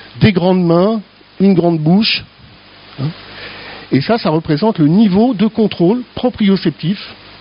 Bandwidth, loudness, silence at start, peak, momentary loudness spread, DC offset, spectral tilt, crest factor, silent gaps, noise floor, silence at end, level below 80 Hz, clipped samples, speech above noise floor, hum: 5.6 kHz; -13 LUFS; 0.15 s; 0 dBFS; 13 LU; under 0.1%; -6 dB/octave; 14 dB; none; -40 dBFS; 0.3 s; -46 dBFS; under 0.1%; 28 dB; none